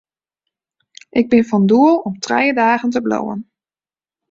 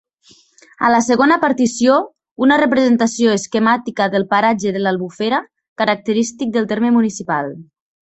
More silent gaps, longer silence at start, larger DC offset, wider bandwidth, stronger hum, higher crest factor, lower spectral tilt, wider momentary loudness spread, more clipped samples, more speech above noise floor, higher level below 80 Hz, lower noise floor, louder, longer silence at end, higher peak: second, none vs 2.31-2.36 s, 5.68-5.76 s; first, 1.15 s vs 0.8 s; neither; about the same, 7.6 kHz vs 8.2 kHz; neither; about the same, 16 dB vs 16 dB; first, -6 dB/octave vs -4.5 dB/octave; first, 10 LU vs 7 LU; neither; first, over 76 dB vs 36 dB; about the same, -58 dBFS vs -58 dBFS; first, under -90 dBFS vs -51 dBFS; about the same, -15 LUFS vs -16 LUFS; first, 0.9 s vs 0.45 s; about the same, -2 dBFS vs 0 dBFS